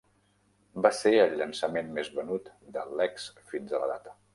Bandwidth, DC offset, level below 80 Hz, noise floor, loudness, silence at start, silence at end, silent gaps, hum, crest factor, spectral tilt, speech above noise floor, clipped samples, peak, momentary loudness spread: 11.5 kHz; under 0.1%; -72 dBFS; -68 dBFS; -29 LUFS; 0.75 s; 0.2 s; none; 50 Hz at -60 dBFS; 22 dB; -4 dB/octave; 39 dB; under 0.1%; -8 dBFS; 17 LU